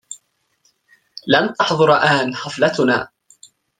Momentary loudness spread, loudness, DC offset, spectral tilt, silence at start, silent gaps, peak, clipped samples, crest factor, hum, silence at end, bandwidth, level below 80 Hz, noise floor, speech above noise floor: 22 LU; -16 LUFS; under 0.1%; -4.5 dB/octave; 0.1 s; none; -2 dBFS; under 0.1%; 18 dB; none; 0.75 s; 9.6 kHz; -60 dBFS; -63 dBFS; 47 dB